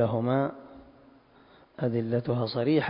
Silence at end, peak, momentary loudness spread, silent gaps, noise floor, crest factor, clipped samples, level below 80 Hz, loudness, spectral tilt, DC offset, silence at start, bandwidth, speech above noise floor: 0 s; -12 dBFS; 23 LU; none; -57 dBFS; 16 dB; under 0.1%; -64 dBFS; -29 LUFS; -11.5 dB/octave; under 0.1%; 0 s; 5.4 kHz; 31 dB